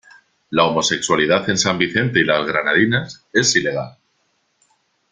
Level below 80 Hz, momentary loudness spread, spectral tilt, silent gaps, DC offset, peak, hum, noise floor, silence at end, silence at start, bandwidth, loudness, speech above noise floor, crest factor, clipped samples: -56 dBFS; 7 LU; -3.5 dB/octave; none; under 0.1%; 0 dBFS; none; -66 dBFS; 1.2 s; 0.5 s; 10 kHz; -17 LUFS; 48 dB; 20 dB; under 0.1%